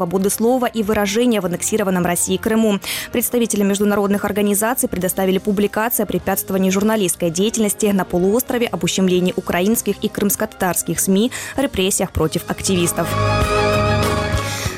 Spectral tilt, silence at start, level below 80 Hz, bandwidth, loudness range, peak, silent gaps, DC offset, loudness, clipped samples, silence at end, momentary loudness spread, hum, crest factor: -4.5 dB/octave; 0 s; -36 dBFS; 17 kHz; 1 LU; -6 dBFS; none; under 0.1%; -18 LUFS; under 0.1%; 0 s; 3 LU; none; 12 dB